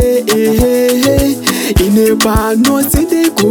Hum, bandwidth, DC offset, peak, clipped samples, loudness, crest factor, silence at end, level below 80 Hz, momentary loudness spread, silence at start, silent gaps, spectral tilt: none; 19.5 kHz; 0.2%; 0 dBFS; under 0.1%; -11 LUFS; 10 dB; 0 s; -24 dBFS; 2 LU; 0 s; none; -4.5 dB/octave